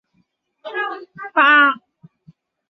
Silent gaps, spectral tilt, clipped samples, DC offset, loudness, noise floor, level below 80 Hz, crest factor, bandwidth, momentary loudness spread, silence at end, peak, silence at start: none; -5 dB/octave; under 0.1%; under 0.1%; -15 LUFS; -66 dBFS; -78 dBFS; 18 dB; 6 kHz; 20 LU; 0.95 s; -2 dBFS; 0.65 s